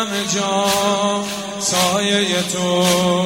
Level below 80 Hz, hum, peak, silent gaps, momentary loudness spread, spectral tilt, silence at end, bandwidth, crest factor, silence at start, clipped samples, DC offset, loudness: -56 dBFS; none; -2 dBFS; none; 5 LU; -3 dB/octave; 0 s; 16 kHz; 16 dB; 0 s; under 0.1%; 0.1%; -17 LUFS